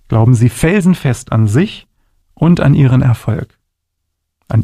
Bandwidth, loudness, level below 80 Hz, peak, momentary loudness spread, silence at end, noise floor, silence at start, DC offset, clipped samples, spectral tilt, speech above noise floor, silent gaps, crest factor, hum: 14 kHz; -12 LUFS; -36 dBFS; 0 dBFS; 10 LU; 0 s; -71 dBFS; 0.1 s; under 0.1%; under 0.1%; -7.5 dB/octave; 61 dB; none; 12 dB; none